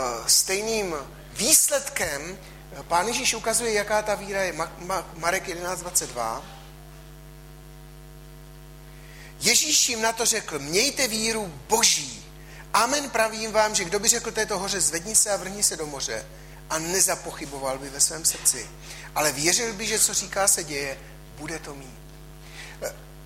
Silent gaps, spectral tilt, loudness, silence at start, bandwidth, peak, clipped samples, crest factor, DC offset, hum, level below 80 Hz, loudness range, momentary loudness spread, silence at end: none; -1 dB/octave; -23 LUFS; 0 s; 16 kHz; -4 dBFS; under 0.1%; 22 dB; under 0.1%; none; -48 dBFS; 7 LU; 19 LU; 0 s